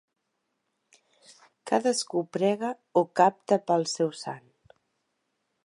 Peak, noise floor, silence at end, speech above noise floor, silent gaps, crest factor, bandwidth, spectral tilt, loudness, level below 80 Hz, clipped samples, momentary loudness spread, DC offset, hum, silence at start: -8 dBFS; -79 dBFS; 1.25 s; 53 dB; none; 22 dB; 11.5 kHz; -4.5 dB/octave; -26 LUFS; -82 dBFS; under 0.1%; 15 LU; under 0.1%; none; 1.65 s